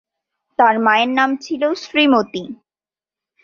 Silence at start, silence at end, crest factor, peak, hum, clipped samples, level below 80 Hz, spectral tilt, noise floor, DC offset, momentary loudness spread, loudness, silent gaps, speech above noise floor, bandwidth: 0.6 s; 0.9 s; 18 dB; -2 dBFS; none; under 0.1%; -64 dBFS; -4 dB/octave; under -90 dBFS; under 0.1%; 14 LU; -16 LUFS; none; over 74 dB; 7.2 kHz